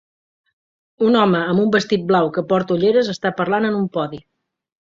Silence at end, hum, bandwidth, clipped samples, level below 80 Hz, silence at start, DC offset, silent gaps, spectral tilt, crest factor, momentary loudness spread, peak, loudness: 0.75 s; none; 7.6 kHz; under 0.1%; -58 dBFS; 1 s; under 0.1%; none; -6.5 dB/octave; 16 dB; 7 LU; -2 dBFS; -18 LUFS